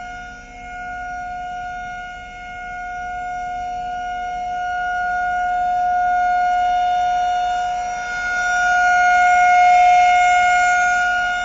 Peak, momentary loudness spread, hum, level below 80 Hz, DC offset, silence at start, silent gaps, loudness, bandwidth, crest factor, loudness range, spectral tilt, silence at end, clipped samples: -6 dBFS; 18 LU; none; -44 dBFS; under 0.1%; 0 s; none; -17 LUFS; 7.8 kHz; 12 dB; 14 LU; 0.5 dB/octave; 0 s; under 0.1%